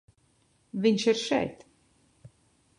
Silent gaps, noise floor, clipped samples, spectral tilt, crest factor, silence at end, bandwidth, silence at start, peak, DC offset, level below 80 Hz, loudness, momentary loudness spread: none; -67 dBFS; under 0.1%; -4.5 dB/octave; 20 dB; 1.25 s; 11 kHz; 0.75 s; -12 dBFS; under 0.1%; -66 dBFS; -27 LUFS; 12 LU